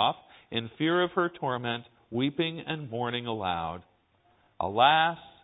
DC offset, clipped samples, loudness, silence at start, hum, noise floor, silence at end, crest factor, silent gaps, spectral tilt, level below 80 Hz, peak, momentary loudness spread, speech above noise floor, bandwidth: under 0.1%; under 0.1%; -29 LUFS; 0 s; none; -66 dBFS; 0.15 s; 22 dB; none; -9 dB/octave; -60 dBFS; -8 dBFS; 14 LU; 38 dB; 4 kHz